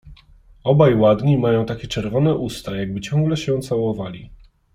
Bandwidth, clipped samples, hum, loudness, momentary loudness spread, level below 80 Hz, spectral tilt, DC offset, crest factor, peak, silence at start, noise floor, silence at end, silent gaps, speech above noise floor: 14.5 kHz; under 0.1%; none; -19 LUFS; 12 LU; -44 dBFS; -7.5 dB/octave; under 0.1%; 18 dB; -2 dBFS; 0.05 s; -49 dBFS; 0.4 s; none; 30 dB